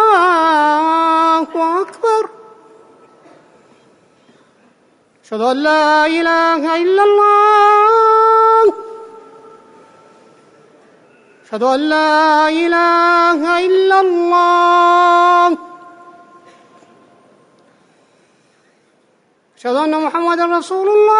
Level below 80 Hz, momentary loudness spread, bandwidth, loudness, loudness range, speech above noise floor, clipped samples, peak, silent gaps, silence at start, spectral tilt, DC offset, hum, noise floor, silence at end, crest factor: -64 dBFS; 8 LU; 11 kHz; -12 LUFS; 13 LU; 45 dB; under 0.1%; -4 dBFS; none; 0 s; -3 dB/octave; under 0.1%; none; -57 dBFS; 0 s; 12 dB